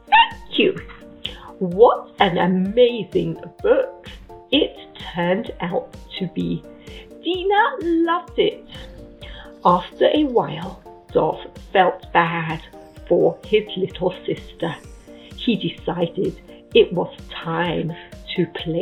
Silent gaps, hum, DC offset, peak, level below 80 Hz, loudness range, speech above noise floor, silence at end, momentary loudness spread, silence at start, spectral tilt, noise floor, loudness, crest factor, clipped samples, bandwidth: none; none; under 0.1%; 0 dBFS; -46 dBFS; 4 LU; 20 dB; 0 s; 19 LU; 0.1 s; -7 dB/octave; -39 dBFS; -20 LUFS; 20 dB; under 0.1%; 9.6 kHz